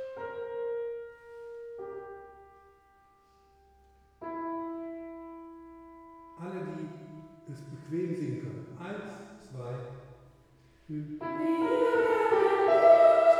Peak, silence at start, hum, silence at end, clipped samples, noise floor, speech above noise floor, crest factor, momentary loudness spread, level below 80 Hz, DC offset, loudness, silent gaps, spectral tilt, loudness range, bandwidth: -10 dBFS; 0 s; none; 0 s; under 0.1%; -63 dBFS; 28 dB; 20 dB; 24 LU; -68 dBFS; under 0.1%; -28 LUFS; none; -7 dB/octave; 15 LU; 11 kHz